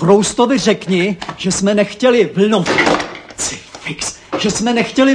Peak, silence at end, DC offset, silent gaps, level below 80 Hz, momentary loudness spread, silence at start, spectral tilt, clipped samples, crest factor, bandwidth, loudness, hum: 0 dBFS; 0 s; under 0.1%; none; -46 dBFS; 9 LU; 0 s; -4 dB/octave; under 0.1%; 14 dB; 10.5 kHz; -15 LUFS; none